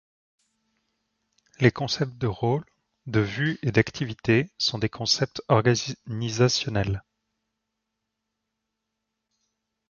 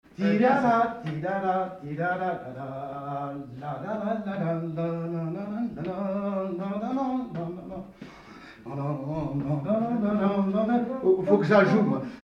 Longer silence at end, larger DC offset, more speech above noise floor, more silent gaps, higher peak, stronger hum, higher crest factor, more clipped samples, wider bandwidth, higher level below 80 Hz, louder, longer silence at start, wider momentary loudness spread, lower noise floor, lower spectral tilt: first, 2.9 s vs 0.05 s; neither; first, 58 dB vs 21 dB; neither; about the same, -4 dBFS vs -6 dBFS; neither; about the same, 24 dB vs 20 dB; neither; about the same, 7.2 kHz vs 7 kHz; first, -52 dBFS vs -60 dBFS; about the same, -25 LUFS vs -27 LUFS; first, 1.6 s vs 0.2 s; second, 8 LU vs 15 LU; first, -82 dBFS vs -47 dBFS; second, -5 dB/octave vs -8.5 dB/octave